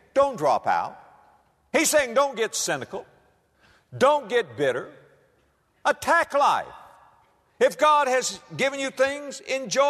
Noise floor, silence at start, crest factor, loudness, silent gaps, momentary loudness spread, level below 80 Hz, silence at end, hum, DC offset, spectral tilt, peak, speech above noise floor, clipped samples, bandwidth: -65 dBFS; 0.15 s; 16 dB; -23 LUFS; none; 13 LU; -64 dBFS; 0 s; none; under 0.1%; -2.5 dB/octave; -8 dBFS; 42 dB; under 0.1%; 13.5 kHz